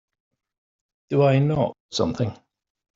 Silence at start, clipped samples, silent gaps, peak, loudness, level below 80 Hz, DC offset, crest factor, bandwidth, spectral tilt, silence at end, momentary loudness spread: 1.1 s; under 0.1%; 1.80-1.89 s; -6 dBFS; -23 LUFS; -56 dBFS; under 0.1%; 18 dB; 7.6 kHz; -7 dB/octave; 0.6 s; 9 LU